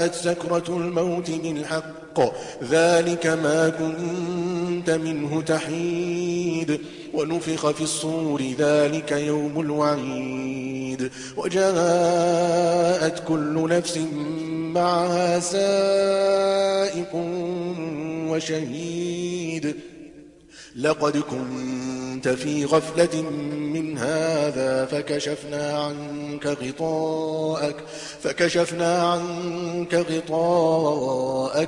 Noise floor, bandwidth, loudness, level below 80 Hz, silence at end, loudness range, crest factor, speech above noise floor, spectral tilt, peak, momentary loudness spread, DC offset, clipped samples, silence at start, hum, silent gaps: -46 dBFS; 11.5 kHz; -24 LUFS; -60 dBFS; 0 s; 5 LU; 18 dB; 23 dB; -5 dB/octave; -4 dBFS; 9 LU; under 0.1%; under 0.1%; 0 s; none; none